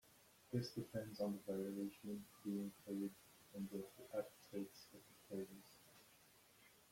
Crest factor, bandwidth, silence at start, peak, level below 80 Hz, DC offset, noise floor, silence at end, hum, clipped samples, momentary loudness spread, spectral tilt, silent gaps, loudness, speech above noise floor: 20 dB; 16.5 kHz; 0.05 s; -30 dBFS; -82 dBFS; under 0.1%; -70 dBFS; 0.05 s; none; under 0.1%; 21 LU; -6.5 dB/octave; none; -49 LUFS; 22 dB